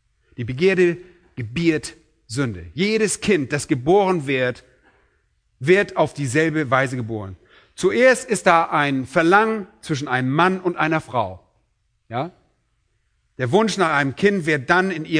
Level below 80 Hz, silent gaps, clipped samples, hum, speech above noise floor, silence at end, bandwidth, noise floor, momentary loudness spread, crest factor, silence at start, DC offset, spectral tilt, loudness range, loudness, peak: -54 dBFS; none; under 0.1%; none; 48 dB; 0 s; 11 kHz; -67 dBFS; 14 LU; 20 dB; 0.4 s; under 0.1%; -5 dB/octave; 5 LU; -20 LUFS; 0 dBFS